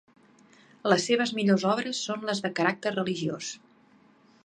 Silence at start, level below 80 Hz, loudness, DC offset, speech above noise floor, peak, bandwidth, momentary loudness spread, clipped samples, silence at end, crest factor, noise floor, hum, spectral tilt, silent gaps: 0.85 s; -76 dBFS; -27 LUFS; under 0.1%; 33 dB; -6 dBFS; 10.5 kHz; 10 LU; under 0.1%; 0.9 s; 22 dB; -60 dBFS; none; -4.5 dB/octave; none